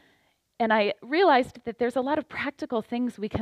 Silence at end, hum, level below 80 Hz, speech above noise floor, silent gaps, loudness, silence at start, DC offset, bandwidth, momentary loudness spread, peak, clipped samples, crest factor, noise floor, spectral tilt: 0 s; none; -58 dBFS; 42 dB; none; -26 LUFS; 0.6 s; under 0.1%; 12.5 kHz; 11 LU; -8 dBFS; under 0.1%; 18 dB; -67 dBFS; -6 dB/octave